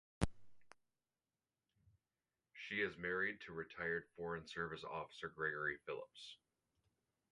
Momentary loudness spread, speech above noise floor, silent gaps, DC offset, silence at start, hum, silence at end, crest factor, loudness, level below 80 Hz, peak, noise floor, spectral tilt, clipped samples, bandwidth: 14 LU; over 45 dB; none; under 0.1%; 0.2 s; none; 1 s; 28 dB; -44 LUFS; -64 dBFS; -20 dBFS; under -90 dBFS; -5 dB/octave; under 0.1%; 11 kHz